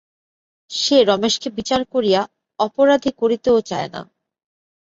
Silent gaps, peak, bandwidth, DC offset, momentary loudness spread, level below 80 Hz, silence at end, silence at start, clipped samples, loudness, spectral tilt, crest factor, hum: none; -2 dBFS; 7.8 kHz; under 0.1%; 12 LU; -56 dBFS; 0.9 s; 0.7 s; under 0.1%; -18 LUFS; -4 dB/octave; 18 dB; none